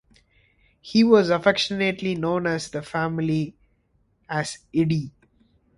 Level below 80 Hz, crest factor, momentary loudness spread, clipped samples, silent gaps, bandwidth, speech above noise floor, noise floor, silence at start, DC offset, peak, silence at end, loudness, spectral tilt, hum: -56 dBFS; 20 dB; 12 LU; under 0.1%; none; 11.5 kHz; 44 dB; -66 dBFS; 0.85 s; under 0.1%; -4 dBFS; 0.7 s; -23 LUFS; -5.5 dB/octave; none